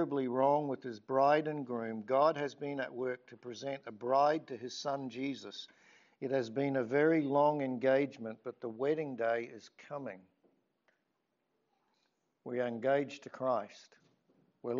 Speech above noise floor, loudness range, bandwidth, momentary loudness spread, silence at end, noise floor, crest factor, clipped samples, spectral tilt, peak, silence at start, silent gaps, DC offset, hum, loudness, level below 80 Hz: 48 dB; 8 LU; 7.4 kHz; 16 LU; 0 s; -82 dBFS; 18 dB; under 0.1%; -4.5 dB/octave; -16 dBFS; 0 s; none; under 0.1%; none; -34 LUFS; -88 dBFS